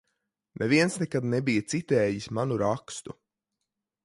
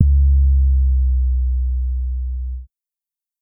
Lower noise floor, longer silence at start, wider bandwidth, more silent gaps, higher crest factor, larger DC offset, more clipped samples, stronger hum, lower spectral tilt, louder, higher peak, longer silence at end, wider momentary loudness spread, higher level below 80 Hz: second, -85 dBFS vs -89 dBFS; first, 0.55 s vs 0 s; first, 11.5 kHz vs 0.3 kHz; neither; about the same, 20 dB vs 16 dB; neither; neither; neither; second, -5.5 dB/octave vs -16.5 dB/octave; second, -27 LUFS vs -19 LUFS; second, -10 dBFS vs 0 dBFS; first, 0.9 s vs 0.75 s; about the same, 12 LU vs 12 LU; second, -62 dBFS vs -16 dBFS